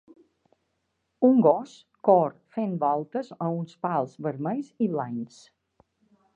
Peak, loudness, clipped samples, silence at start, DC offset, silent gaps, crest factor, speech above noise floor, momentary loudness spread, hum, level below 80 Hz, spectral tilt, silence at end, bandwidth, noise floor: -6 dBFS; -26 LUFS; under 0.1%; 1.2 s; under 0.1%; none; 20 dB; 52 dB; 13 LU; none; -80 dBFS; -9 dB/octave; 1.1 s; 7.8 kHz; -77 dBFS